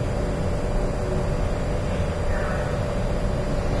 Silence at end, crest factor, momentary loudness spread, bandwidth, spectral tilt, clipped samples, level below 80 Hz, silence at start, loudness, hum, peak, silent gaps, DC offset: 0 s; 12 dB; 1 LU; 11 kHz; -7 dB/octave; under 0.1%; -28 dBFS; 0 s; -26 LUFS; none; -12 dBFS; none; under 0.1%